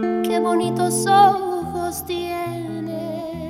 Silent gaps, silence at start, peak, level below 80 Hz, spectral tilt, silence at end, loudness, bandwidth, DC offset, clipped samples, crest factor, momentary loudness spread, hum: none; 0 s; -2 dBFS; -52 dBFS; -4.5 dB/octave; 0 s; -20 LUFS; 16.5 kHz; under 0.1%; under 0.1%; 18 dB; 14 LU; none